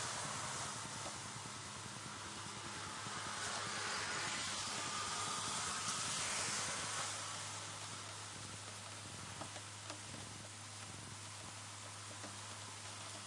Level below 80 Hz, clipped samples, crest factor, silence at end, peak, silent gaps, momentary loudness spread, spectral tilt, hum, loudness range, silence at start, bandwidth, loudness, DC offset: -74 dBFS; under 0.1%; 18 dB; 0 s; -28 dBFS; none; 10 LU; -1.5 dB/octave; none; 9 LU; 0 s; 11.5 kHz; -43 LUFS; under 0.1%